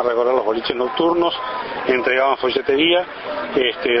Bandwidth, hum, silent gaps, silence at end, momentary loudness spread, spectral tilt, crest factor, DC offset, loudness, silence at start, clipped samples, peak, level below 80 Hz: 6 kHz; none; none; 0 s; 8 LU; -6.5 dB/octave; 14 dB; under 0.1%; -19 LUFS; 0 s; under 0.1%; -4 dBFS; -54 dBFS